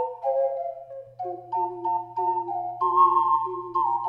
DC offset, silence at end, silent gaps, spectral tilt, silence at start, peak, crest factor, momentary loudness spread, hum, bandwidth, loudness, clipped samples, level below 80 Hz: under 0.1%; 0 s; none; -8.5 dB/octave; 0 s; -8 dBFS; 16 dB; 16 LU; none; 5.2 kHz; -25 LUFS; under 0.1%; -72 dBFS